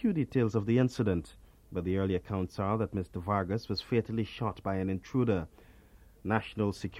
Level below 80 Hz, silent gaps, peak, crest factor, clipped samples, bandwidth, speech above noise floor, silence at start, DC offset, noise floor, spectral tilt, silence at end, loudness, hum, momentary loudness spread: -54 dBFS; none; -12 dBFS; 20 dB; under 0.1%; 13 kHz; 26 dB; 0 s; under 0.1%; -57 dBFS; -7.5 dB/octave; 0 s; -32 LUFS; none; 8 LU